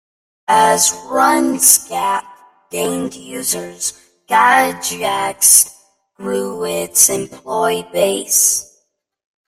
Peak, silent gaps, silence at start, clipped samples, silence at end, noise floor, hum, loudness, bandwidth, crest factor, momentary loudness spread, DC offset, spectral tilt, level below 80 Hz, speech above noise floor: 0 dBFS; none; 0.5 s; under 0.1%; 0.85 s; -64 dBFS; none; -14 LUFS; 16.5 kHz; 16 dB; 13 LU; under 0.1%; -1.5 dB/octave; -58 dBFS; 49 dB